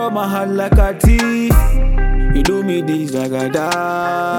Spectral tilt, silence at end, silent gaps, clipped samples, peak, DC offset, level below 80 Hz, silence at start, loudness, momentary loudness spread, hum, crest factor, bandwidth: -6 dB/octave; 0 s; none; under 0.1%; 0 dBFS; under 0.1%; -16 dBFS; 0 s; -16 LUFS; 5 LU; none; 12 dB; 17.5 kHz